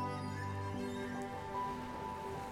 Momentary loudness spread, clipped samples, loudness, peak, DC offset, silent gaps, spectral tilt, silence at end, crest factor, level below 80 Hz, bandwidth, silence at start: 2 LU; under 0.1%; -42 LUFS; -28 dBFS; under 0.1%; none; -6 dB/octave; 0 s; 14 dB; -62 dBFS; 16.5 kHz; 0 s